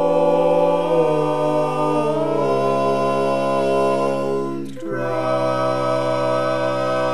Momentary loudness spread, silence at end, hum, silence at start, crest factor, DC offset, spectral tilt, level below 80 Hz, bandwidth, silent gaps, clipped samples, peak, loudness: 6 LU; 0 s; none; 0 s; 14 dB; 2%; -6.5 dB/octave; -62 dBFS; 12.5 kHz; none; under 0.1%; -6 dBFS; -19 LUFS